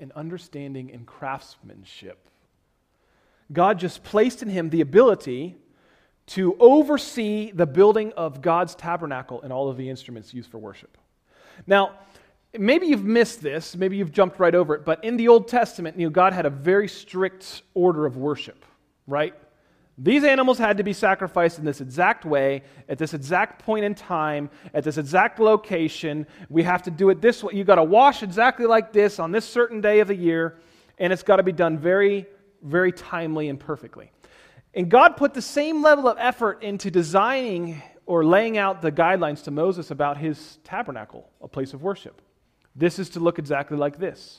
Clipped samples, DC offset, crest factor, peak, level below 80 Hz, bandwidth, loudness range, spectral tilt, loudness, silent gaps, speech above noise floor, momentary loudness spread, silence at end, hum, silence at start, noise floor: under 0.1%; under 0.1%; 22 dB; 0 dBFS; -62 dBFS; 15 kHz; 8 LU; -6 dB/octave; -21 LUFS; none; 47 dB; 16 LU; 0.25 s; none; 0 s; -68 dBFS